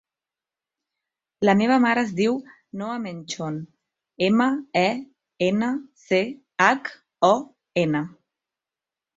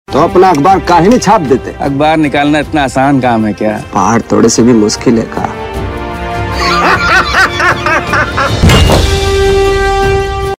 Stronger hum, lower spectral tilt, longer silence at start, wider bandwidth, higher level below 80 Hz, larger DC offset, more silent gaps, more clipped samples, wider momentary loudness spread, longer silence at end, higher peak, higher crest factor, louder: neither; about the same, -5.5 dB/octave vs -5 dB/octave; first, 1.4 s vs 0.1 s; second, 8 kHz vs 16.5 kHz; second, -66 dBFS vs -20 dBFS; neither; neither; second, under 0.1% vs 0.6%; first, 13 LU vs 9 LU; first, 1.05 s vs 0.05 s; about the same, -2 dBFS vs 0 dBFS; first, 22 dB vs 8 dB; second, -23 LUFS vs -9 LUFS